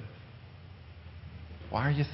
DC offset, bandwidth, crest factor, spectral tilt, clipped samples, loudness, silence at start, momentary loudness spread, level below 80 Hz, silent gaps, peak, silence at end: under 0.1%; 5.8 kHz; 20 dB; -10.5 dB/octave; under 0.1%; -35 LUFS; 0 s; 20 LU; -50 dBFS; none; -16 dBFS; 0 s